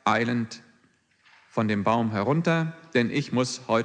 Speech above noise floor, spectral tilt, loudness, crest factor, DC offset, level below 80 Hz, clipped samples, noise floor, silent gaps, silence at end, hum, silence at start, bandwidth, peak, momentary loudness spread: 39 dB; -6 dB/octave; -26 LUFS; 18 dB; under 0.1%; -64 dBFS; under 0.1%; -64 dBFS; none; 0 s; none; 0.05 s; 9.8 kHz; -8 dBFS; 7 LU